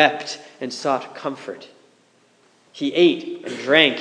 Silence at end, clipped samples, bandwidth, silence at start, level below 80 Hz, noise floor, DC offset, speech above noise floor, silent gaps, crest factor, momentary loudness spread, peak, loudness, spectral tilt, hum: 0 s; under 0.1%; 10 kHz; 0 s; -82 dBFS; -58 dBFS; under 0.1%; 38 dB; none; 22 dB; 17 LU; 0 dBFS; -21 LUFS; -4 dB/octave; none